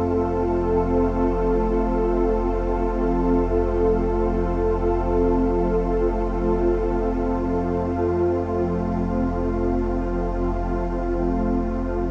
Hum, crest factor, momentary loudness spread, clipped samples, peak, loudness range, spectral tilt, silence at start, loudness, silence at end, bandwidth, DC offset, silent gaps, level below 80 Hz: none; 12 dB; 4 LU; under 0.1%; -8 dBFS; 2 LU; -10 dB/octave; 0 s; -23 LUFS; 0 s; 6.4 kHz; under 0.1%; none; -28 dBFS